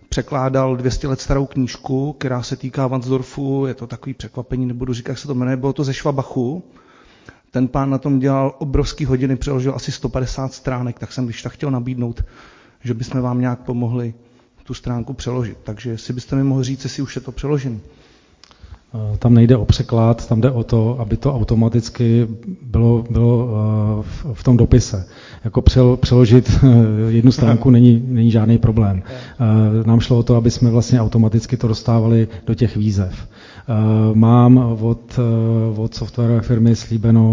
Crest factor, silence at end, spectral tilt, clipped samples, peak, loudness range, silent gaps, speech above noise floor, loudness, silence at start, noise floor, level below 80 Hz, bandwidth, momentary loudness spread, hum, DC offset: 16 dB; 0 s; -8 dB/octave; under 0.1%; 0 dBFS; 10 LU; none; 33 dB; -17 LUFS; 0.1 s; -49 dBFS; -32 dBFS; 7.6 kHz; 14 LU; none; under 0.1%